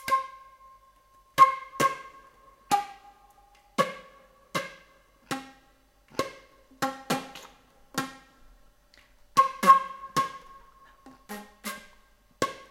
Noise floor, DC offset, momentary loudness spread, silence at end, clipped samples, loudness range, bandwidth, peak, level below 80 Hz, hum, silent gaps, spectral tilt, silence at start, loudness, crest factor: -62 dBFS; under 0.1%; 22 LU; 0.15 s; under 0.1%; 9 LU; 16.5 kHz; -4 dBFS; -64 dBFS; none; none; -3 dB/octave; 0.05 s; -27 LUFS; 26 dB